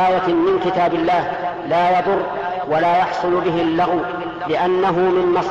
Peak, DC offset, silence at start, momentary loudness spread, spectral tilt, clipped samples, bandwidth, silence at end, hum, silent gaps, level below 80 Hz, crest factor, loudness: -8 dBFS; 0.1%; 0 s; 7 LU; -7 dB/octave; under 0.1%; 7.6 kHz; 0 s; none; none; -50 dBFS; 10 dB; -18 LUFS